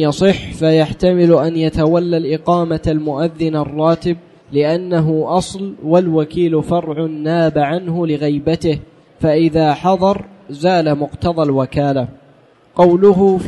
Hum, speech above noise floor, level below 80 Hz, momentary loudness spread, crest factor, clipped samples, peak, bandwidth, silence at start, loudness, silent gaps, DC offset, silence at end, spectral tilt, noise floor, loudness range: none; 34 dB; -40 dBFS; 8 LU; 14 dB; under 0.1%; -2 dBFS; 11.5 kHz; 0 s; -15 LUFS; none; under 0.1%; 0 s; -7.5 dB/octave; -48 dBFS; 2 LU